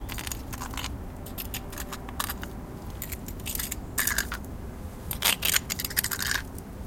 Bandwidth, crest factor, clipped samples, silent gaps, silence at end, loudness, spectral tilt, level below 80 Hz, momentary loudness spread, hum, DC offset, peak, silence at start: 17 kHz; 28 dB; under 0.1%; none; 0 s; -30 LUFS; -2 dB/octave; -40 dBFS; 15 LU; none; under 0.1%; -4 dBFS; 0 s